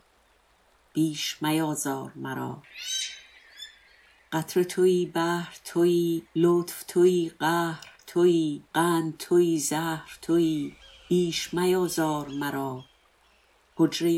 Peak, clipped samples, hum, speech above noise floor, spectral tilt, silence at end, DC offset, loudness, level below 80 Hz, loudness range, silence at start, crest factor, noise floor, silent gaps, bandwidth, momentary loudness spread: -10 dBFS; under 0.1%; none; 38 dB; -5 dB/octave; 0 s; under 0.1%; -26 LUFS; -66 dBFS; 6 LU; 0.95 s; 16 dB; -63 dBFS; none; 16.5 kHz; 13 LU